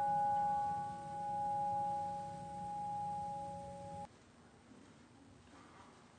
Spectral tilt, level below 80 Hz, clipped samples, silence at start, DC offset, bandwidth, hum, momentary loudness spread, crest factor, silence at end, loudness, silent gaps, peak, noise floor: -6 dB/octave; -70 dBFS; under 0.1%; 0 s; under 0.1%; 9.6 kHz; none; 25 LU; 12 dB; 0 s; -41 LUFS; none; -28 dBFS; -63 dBFS